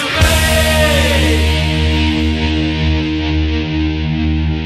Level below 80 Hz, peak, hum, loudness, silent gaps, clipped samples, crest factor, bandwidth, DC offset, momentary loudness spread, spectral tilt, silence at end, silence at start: -18 dBFS; 0 dBFS; none; -14 LUFS; none; under 0.1%; 12 dB; 15 kHz; under 0.1%; 5 LU; -5 dB/octave; 0 s; 0 s